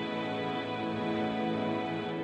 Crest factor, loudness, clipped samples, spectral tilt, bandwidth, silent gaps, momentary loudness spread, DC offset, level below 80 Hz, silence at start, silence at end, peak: 12 dB; -33 LUFS; under 0.1%; -7 dB/octave; 9 kHz; none; 2 LU; under 0.1%; -68 dBFS; 0 s; 0 s; -20 dBFS